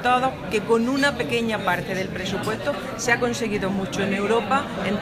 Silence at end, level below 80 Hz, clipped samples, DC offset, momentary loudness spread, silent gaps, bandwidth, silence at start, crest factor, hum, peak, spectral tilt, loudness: 0 s; -48 dBFS; under 0.1%; under 0.1%; 6 LU; none; 15.5 kHz; 0 s; 18 dB; none; -4 dBFS; -4.5 dB/octave; -23 LUFS